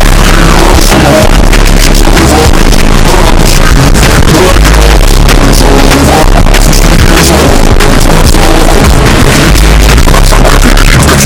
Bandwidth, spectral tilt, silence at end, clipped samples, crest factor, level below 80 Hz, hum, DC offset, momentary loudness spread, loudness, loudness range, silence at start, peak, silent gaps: 17.5 kHz; -4.5 dB/octave; 0 s; 10%; 2 dB; -4 dBFS; none; under 0.1%; 2 LU; -4 LUFS; 0 LU; 0 s; 0 dBFS; none